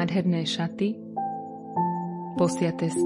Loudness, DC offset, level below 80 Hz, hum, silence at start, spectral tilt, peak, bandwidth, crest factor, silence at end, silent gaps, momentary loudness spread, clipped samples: -28 LUFS; under 0.1%; -68 dBFS; none; 0 s; -6 dB/octave; -10 dBFS; 11.5 kHz; 16 dB; 0 s; none; 8 LU; under 0.1%